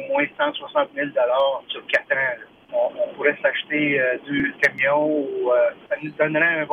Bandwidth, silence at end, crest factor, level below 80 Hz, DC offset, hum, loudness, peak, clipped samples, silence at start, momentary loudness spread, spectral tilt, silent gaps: 9 kHz; 0 s; 16 dB; -64 dBFS; under 0.1%; none; -21 LUFS; -6 dBFS; under 0.1%; 0 s; 6 LU; -5.5 dB/octave; none